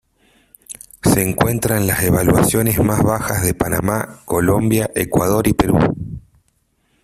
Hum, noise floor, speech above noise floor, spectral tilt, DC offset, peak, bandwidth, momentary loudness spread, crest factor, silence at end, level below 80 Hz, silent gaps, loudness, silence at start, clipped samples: none; -63 dBFS; 47 dB; -5.5 dB/octave; under 0.1%; -2 dBFS; 16 kHz; 10 LU; 16 dB; 0.85 s; -36 dBFS; none; -16 LUFS; 0.7 s; under 0.1%